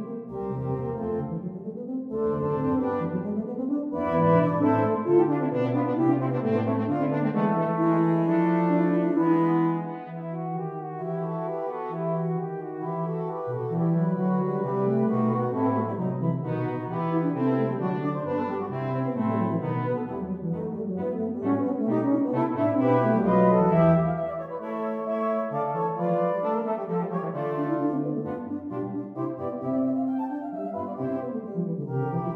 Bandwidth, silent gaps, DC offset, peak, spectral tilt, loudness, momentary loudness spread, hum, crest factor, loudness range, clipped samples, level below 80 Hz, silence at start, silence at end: 4.5 kHz; none; under 0.1%; -10 dBFS; -11 dB/octave; -26 LUFS; 10 LU; none; 16 dB; 6 LU; under 0.1%; -60 dBFS; 0 s; 0 s